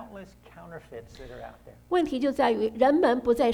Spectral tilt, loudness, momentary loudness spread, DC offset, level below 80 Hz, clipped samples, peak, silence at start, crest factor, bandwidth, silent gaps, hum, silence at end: -5.5 dB/octave; -24 LUFS; 22 LU; under 0.1%; -54 dBFS; under 0.1%; -10 dBFS; 0 s; 16 dB; 16 kHz; none; 60 Hz at -55 dBFS; 0 s